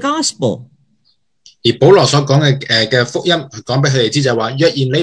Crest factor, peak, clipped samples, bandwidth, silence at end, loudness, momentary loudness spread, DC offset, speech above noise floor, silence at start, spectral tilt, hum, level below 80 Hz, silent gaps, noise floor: 14 dB; 0 dBFS; 0.3%; 10.5 kHz; 0 s; -13 LUFS; 9 LU; under 0.1%; 48 dB; 0 s; -5 dB/octave; none; -52 dBFS; none; -61 dBFS